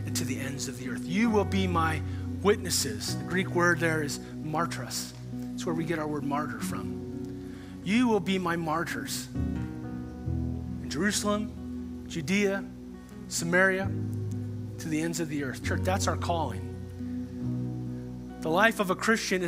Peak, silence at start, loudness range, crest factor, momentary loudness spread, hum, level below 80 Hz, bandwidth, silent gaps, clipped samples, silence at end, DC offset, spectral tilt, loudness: -6 dBFS; 0 s; 4 LU; 22 dB; 13 LU; none; -52 dBFS; 16 kHz; none; under 0.1%; 0 s; under 0.1%; -4.5 dB/octave; -30 LUFS